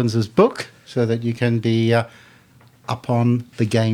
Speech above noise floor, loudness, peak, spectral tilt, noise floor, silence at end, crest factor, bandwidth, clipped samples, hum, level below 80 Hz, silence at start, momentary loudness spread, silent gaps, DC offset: 32 dB; -20 LUFS; -2 dBFS; -7 dB/octave; -51 dBFS; 0 s; 18 dB; 11.5 kHz; under 0.1%; none; -60 dBFS; 0 s; 12 LU; none; under 0.1%